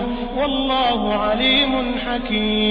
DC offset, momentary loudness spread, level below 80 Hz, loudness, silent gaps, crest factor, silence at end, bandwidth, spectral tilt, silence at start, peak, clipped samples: under 0.1%; 7 LU; -34 dBFS; -19 LUFS; none; 14 dB; 0 s; 5.2 kHz; -7 dB/octave; 0 s; -6 dBFS; under 0.1%